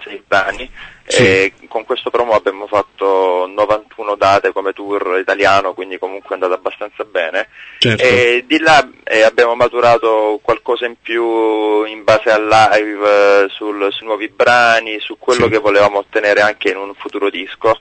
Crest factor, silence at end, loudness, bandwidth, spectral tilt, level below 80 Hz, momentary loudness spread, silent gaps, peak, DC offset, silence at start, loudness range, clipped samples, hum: 14 dB; 0.05 s; -13 LUFS; 9 kHz; -4 dB/octave; -48 dBFS; 11 LU; none; 0 dBFS; under 0.1%; 0 s; 4 LU; under 0.1%; none